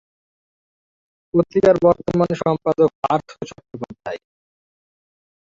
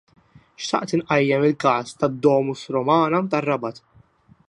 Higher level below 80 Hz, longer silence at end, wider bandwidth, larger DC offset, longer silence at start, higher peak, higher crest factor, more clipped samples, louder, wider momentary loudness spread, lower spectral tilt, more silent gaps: first, -52 dBFS vs -62 dBFS; first, 1.45 s vs 0.7 s; second, 7.6 kHz vs 11 kHz; neither; first, 1.35 s vs 0.6 s; about the same, -2 dBFS vs -4 dBFS; about the same, 20 dB vs 18 dB; neither; first, -18 LUFS vs -21 LUFS; first, 19 LU vs 7 LU; first, -8 dB/octave vs -6 dB/octave; first, 2.95-3.03 s vs none